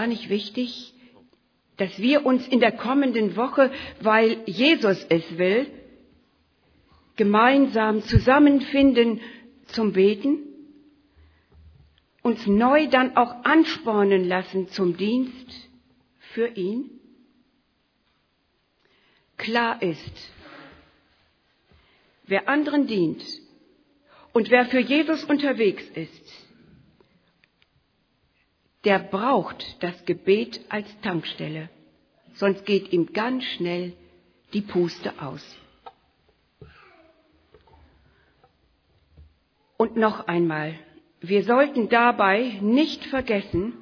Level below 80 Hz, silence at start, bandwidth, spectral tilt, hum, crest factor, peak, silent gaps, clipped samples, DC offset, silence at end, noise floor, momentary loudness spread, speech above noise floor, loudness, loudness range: -50 dBFS; 0 s; 5.4 kHz; -7 dB/octave; none; 22 dB; -2 dBFS; none; under 0.1%; under 0.1%; 0 s; -69 dBFS; 16 LU; 47 dB; -22 LUFS; 11 LU